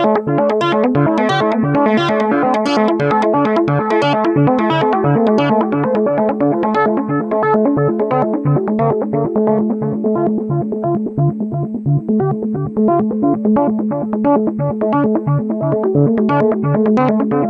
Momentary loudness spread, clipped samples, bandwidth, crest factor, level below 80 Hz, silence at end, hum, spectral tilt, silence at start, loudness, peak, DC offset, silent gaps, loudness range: 4 LU; under 0.1%; 8.2 kHz; 14 dB; -52 dBFS; 0 s; none; -8.5 dB/octave; 0 s; -15 LUFS; -2 dBFS; under 0.1%; none; 3 LU